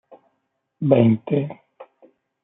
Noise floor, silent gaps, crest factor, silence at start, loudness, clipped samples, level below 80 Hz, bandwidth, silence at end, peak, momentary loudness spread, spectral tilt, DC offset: -74 dBFS; none; 20 dB; 0.8 s; -19 LUFS; under 0.1%; -64 dBFS; 3.9 kHz; 0.6 s; -2 dBFS; 16 LU; -12.5 dB/octave; under 0.1%